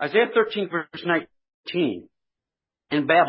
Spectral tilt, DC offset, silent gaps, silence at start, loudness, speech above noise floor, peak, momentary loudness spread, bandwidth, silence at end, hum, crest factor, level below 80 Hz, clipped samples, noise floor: -10 dB/octave; under 0.1%; 1.54-1.64 s; 0 s; -24 LUFS; 67 dB; -4 dBFS; 10 LU; 5.8 kHz; 0 s; none; 20 dB; -70 dBFS; under 0.1%; -89 dBFS